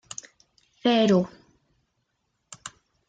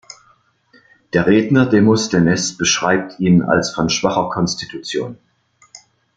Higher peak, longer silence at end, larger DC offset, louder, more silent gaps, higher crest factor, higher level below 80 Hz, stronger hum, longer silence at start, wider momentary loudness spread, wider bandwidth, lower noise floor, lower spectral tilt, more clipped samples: second, -10 dBFS vs 0 dBFS; about the same, 0.4 s vs 0.4 s; neither; second, -23 LUFS vs -16 LUFS; neither; about the same, 18 dB vs 16 dB; second, -66 dBFS vs -50 dBFS; neither; second, 0.85 s vs 1.15 s; first, 22 LU vs 11 LU; about the same, 9.2 kHz vs 9.2 kHz; first, -76 dBFS vs -56 dBFS; about the same, -5.5 dB/octave vs -4.5 dB/octave; neither